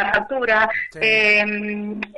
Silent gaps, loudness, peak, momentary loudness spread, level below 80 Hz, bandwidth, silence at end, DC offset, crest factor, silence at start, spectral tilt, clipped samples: none; -18 LUFS; 0 dBFS; 12 LU; -52 dBFS; 11.5 kHz; 0 s; under 0.1%; 18 dB; 0 s; -4.5 dB/octave; under 0.1%